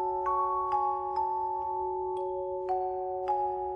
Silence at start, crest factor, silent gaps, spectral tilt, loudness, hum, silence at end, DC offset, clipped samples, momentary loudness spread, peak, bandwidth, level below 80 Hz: 0 s; 12 dB; none; -8 dB/octave; -31 LUFS; none; 0 s; under 0.1%; under 0.1%; 5 LU; -18 dBFS; 5.4 kHz; -60 dBFS